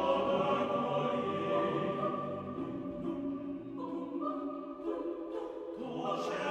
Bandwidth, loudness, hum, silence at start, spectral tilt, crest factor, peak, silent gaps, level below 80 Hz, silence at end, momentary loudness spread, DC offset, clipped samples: 9.2 kHz; -36 LUFS; none; 0 s; -7 dB/octave; 16 dB; -20 dBFS; none; -68 dBFS; 0 s; 10 LU; under 0.1%; under 0.1%